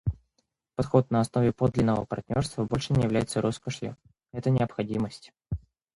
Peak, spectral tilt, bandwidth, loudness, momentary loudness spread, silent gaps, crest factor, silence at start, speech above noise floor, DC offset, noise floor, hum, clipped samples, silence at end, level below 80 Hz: -8 dBFS; -7 dB/octave; 11.5 kHz; -28 LUFS; 14 LU; none; 20 dB; 0.05 s; 49 dB; under 0.1%; -76 dBFS; none; under 0.1%; 0.4 s; -48 dBFS